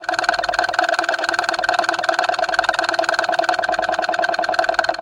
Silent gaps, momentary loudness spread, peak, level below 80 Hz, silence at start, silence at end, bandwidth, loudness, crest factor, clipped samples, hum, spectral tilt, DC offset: none; 1 LU; 0 dBFS; -54 dBFS; 0 s; 0 s; 12 kHz; -19 LUFS; 18 dB; under 0.1%; none; -1.5 dB/octave; under 0.1%